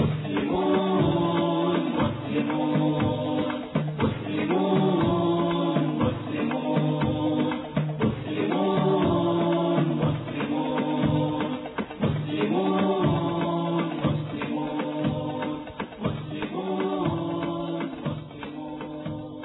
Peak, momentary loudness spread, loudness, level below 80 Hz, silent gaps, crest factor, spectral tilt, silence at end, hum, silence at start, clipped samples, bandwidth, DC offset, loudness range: -10 dBFS; 9 LU; -26 LUFS; -52 dBFS; none; 14 dB; -11 dB/octave; 0 s; none; 0 s; under 0.1%; 4.1 kHz; under 0.1%; 5 LU